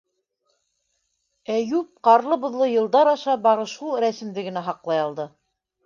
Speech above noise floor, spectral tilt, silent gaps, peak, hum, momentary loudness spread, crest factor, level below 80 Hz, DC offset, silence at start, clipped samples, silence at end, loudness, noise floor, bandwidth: 52 dB; -5.5 dB/octave; none; -4 dBFS; none; 12 LU; 20 dB; -76 dBFS; under 0.1%; 1.5 s; under 0.1%; 0.6 s; -22 LUFS; -73 dBFS; 7.2 kHz